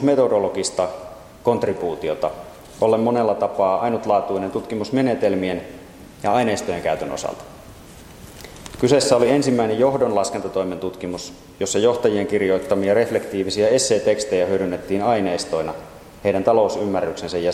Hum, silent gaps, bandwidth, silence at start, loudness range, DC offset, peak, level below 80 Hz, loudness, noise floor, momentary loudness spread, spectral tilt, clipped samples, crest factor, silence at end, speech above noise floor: none; none; 16 kHz; 0 s; 3 LU; under 0.1%; 0 dBFS; -52 dBFS; -20 LUFS; -41 dBFS; 16 LU; -5 dB/octave; under 0.1%; 20 dB; 0 s; 22 dB